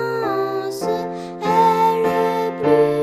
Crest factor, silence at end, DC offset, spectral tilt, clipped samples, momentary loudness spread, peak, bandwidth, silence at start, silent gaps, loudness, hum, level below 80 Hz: 14 dB; 0 s; under 0.1%; -6 dB/octave; under 0.1%; 9 LU; -4 dBFS; 15 kHz; 0 s; none; -19 LUFS; none; -56 dBFS